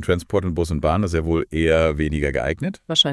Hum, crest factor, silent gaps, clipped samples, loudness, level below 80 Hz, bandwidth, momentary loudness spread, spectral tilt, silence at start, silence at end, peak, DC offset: none; 16 dB; none; under 0.1%; -21 LUFS; -34 dBFS; 12 kHz; 6 LU; -5.5 dB/octave; 0 s; 0 s; -4 dBFS; under 0.1%